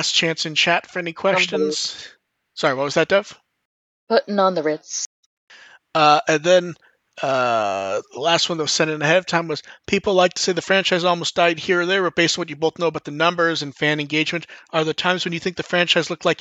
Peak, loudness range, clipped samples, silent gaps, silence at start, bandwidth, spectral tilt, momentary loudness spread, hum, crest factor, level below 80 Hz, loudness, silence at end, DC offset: -2 dBFS; 3 LU; under 0.1%; 3.65-4.07 s, 5.06-5.47 s; 0 s; 9 kHz; -3.5 dB/octave; 9 LU; none; 18 dB; -64 dBFS; -19 LUFS; 0.05 s; under 0.1%